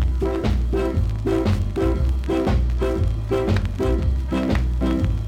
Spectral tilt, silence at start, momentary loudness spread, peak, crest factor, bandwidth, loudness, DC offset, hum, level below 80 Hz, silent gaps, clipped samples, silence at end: -8 dB/octave; 0 s; 2 LU; -8 dBFS; 12 dB; 9.8 kHz; -22 LUFS; under 0.1%; none; -24 dBFS; none; under 0.1%; 0 s